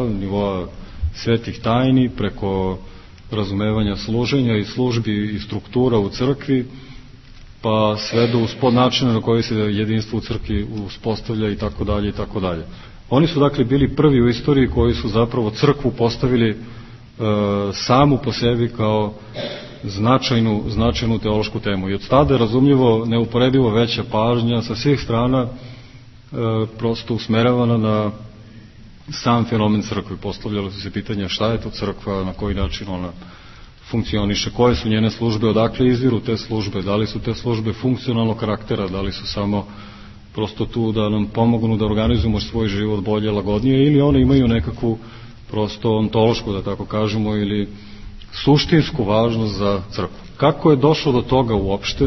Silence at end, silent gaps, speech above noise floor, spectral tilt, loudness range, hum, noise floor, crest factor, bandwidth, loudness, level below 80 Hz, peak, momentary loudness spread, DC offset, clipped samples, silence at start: 0 s; none; 23 dB; -7 dB/octave; 5 LU; none; -41 dBFS; 18 dB; 6.2 kHz; -19 LUFS; -34 dBFS; 0 dBFS; 11 LU; under 0.1%; under 0.1%; 0 s